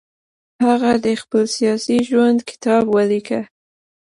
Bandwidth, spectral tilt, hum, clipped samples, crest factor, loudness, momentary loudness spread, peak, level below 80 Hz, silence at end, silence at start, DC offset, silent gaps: 11.5 kHz; -5 dB/octave; none; under 0.1%; 14 dB; -17 LUFS; 6 LU; -4 dBFS; -58 dBFS; 0.7 s; 0.6 s; under 0.1%; none